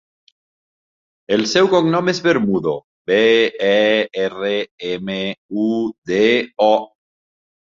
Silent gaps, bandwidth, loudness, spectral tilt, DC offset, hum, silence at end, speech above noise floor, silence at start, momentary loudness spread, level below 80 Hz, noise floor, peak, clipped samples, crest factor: 2.84-3.05 s, 4.71-4.78 s, 5.38-5.49 s, 5.98-6.02 s; 7.6 kHz; -17 LUFS; -5 dB/octave; under 0.1%; none; 0.8 s; over 73 dB; 1.3 s; 9 LU; -60 dBFS; under -90 dBFS; -2 dBFS; under 0.1%; 16 dB